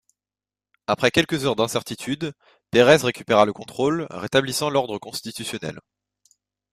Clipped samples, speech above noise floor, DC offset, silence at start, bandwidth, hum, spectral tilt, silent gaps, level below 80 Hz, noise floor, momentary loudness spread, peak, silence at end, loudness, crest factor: under 0.1%; over 68 dB; under 0.1%; 0.9 s; 15.5 kHz; 50 Hz at -55 dBFS; -4.5 dB/octave; none; -58 dBFS; under -90 dBFS; 13 LU; -2 dBFS; 0.95 s; -22 LUFS; 22 dB